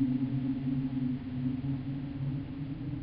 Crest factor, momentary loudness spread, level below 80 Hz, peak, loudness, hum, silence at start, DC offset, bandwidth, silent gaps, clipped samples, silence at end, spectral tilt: 14 dB; 6 LU; -52 dBFS; -18 dBFS; -34 LUFS; none; 0 s; under 0.1%; 5 kHz; none; under 0.1%; 0 s; -9.5 dB/octave